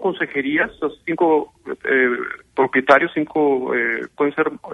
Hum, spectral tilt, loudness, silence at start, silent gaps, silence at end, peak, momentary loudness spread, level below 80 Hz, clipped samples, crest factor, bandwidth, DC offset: none; -6.5 dB/octave; -19 LUFS; 0 s; none; 0 s; 0 dBFS; 10 LU; -58 dBFS; under 0.1%; 20 dB; 8.6 kHz; under 0.1%